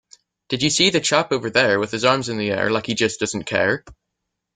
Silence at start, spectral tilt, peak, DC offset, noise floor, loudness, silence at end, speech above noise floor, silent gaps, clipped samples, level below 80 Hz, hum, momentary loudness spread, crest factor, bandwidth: 0.5 s; -3 dB/octave; -2 dBFS; under 0.1%; -79 dBFS; -19 LUFS; 0.65 s; 59 dB; none; under 0.1%; -56 dBFS; none; 7 LU; 20 dB; 9.6 kHz